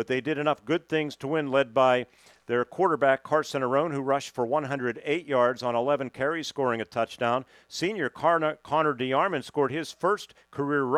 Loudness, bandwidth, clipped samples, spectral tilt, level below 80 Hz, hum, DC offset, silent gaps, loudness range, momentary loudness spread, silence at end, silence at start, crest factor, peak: -27 LUFS; 14 kHz; under 0.1%; -5.5 dB/octave; -70 dBFS; none; under 0.1%; none; 2 LU; 7 LU; 0 s; 0 s; 18 dB; -8 dBFS